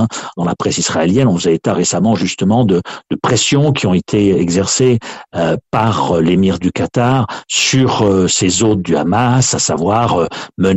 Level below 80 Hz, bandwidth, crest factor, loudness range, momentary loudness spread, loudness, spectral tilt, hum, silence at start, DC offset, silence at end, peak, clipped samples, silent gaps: -44 dBFS; 8.4 kHz; 12 dB; 1 LU; 6 LU; -13 LUFS; -4.5 dB/octave; none; 0 s; under 0.1%; 0 s; -2 dBFS; under 0.1%; none